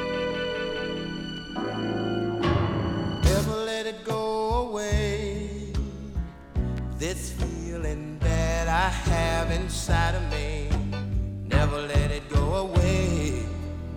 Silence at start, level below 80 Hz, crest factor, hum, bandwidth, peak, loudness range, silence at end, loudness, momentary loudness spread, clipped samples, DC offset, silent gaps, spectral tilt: 0 s; -32 dBFS; 18 dB; none; 17 kHz; -8 dBFS; 4 LU; 0 s; -27 LUFS; 8 LU; under 0.1%; under 0.1%; none; -5.5 dB/octave